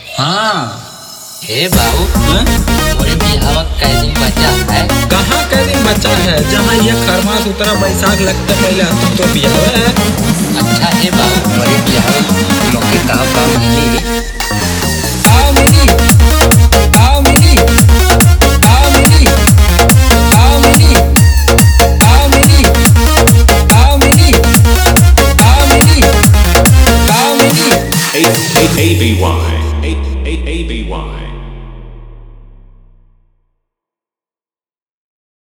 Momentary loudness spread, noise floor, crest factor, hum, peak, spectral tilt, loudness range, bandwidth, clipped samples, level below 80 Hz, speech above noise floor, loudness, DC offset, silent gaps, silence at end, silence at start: 8 LU; under -90 dBFS; 8 dB; none; 0 dBFS; -4.5 dB/octave; 6 LU; over 20 kHz; 1%; -14 dBFS; over 80 dB; -8 LUFS; under 0.1%; none; 3.15 s; 0 s